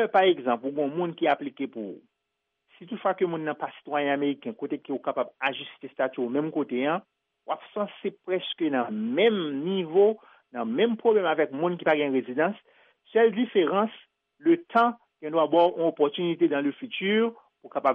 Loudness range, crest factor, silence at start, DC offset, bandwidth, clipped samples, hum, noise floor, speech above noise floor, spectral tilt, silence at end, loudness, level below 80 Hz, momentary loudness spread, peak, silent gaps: 6 LU; 18 dB; 0 s; under 0.1%; 4.9 kHz; under 0.1%; none; -81 dBFS; 56 dB; -3.5 dB/octave; 0 s; -26 LUFS; -80 dBFS; 12 LU; -8 dBFS; none